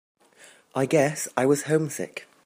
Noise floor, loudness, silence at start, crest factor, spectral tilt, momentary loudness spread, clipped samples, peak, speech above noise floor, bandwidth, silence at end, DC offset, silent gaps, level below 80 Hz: -54 dBFS; -24 LUFS; 0.75 s; 20 dB; -5 dB/octave; 12 LU; under 0.1%; -6 dBFS; 30 dB; 15.5 kHz; 0.2 s; under 0.1%; none; -70 dBFS